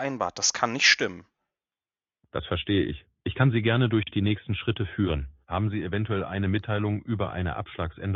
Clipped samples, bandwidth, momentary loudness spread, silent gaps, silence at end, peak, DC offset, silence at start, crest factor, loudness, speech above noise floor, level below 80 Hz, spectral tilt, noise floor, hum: under 0.1%; 7.8 kHz; 11 LU; none; 0 s; -6 dBFS; under 0.1%; 0 s; 22 dB; -26 LUFS; over 64 dB; -46 dBFS; -4.5 dB/octave; under -90 dBFS; none